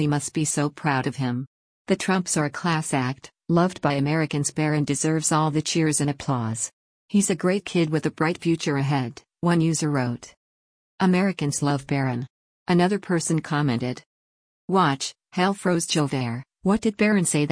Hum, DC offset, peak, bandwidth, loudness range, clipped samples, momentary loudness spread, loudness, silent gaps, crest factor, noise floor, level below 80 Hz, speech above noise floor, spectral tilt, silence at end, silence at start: none; under 0.1%; -8 dBFS; 10.5 kHz; 2 LU; under 0.1%; 8 LU; -24 LUFS; 1.47-1.85 s, 6.73-7.08 s, 10.37-10.98 s, 12.30-12.66 s, 14.06-14.68 s; 16 dB; under -90 dBFS; -58 dBFS; over 67 dB; -5 dB/octave; 0 s; 0 s